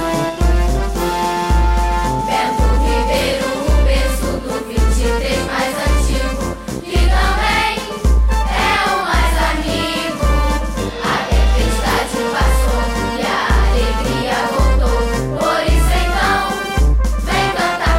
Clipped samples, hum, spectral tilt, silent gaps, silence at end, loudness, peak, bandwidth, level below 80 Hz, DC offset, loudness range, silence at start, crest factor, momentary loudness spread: under 0.1%; none; -5 dB/octave; none; 0 s; -16 LUFS; -4 dBFS; 15.5 kHz; -18 dBFS; under 0.1%; 1 LU; 0 s; 10 dB; 4 LU